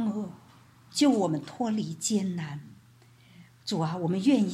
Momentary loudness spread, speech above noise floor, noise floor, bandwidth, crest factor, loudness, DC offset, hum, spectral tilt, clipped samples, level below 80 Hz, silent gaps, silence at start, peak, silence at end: 15 LU; 30 dB; -57 dBFS; 14 kHz; 16 dB; -28 LUFS; under 0.1%; none; -5.5 dB/octave; under 0.1%; -72 dBFS; none; 0 s; -12 dBFS; 0 s